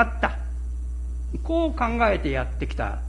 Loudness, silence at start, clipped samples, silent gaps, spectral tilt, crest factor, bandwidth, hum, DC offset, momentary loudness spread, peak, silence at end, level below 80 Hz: -26 LUFS; 0 s; under 0.1%; none; -7 dB/octave; 20 dB; 10 kHz; none; under 0.1%; 10 LU; -4 dBFS; 0 s; -28 dBFS